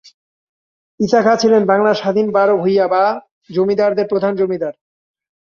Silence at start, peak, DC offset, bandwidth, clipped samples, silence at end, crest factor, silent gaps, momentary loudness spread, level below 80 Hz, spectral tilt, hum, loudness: 1 s; -2 dBFS; under 0.1%; 7.2 kHz; under 0.1%; 0.7 s; 14 dB; 3.31-3.42 s; 10 LU; -60 dBFS; -6 dB/octave; none; -15 LUFS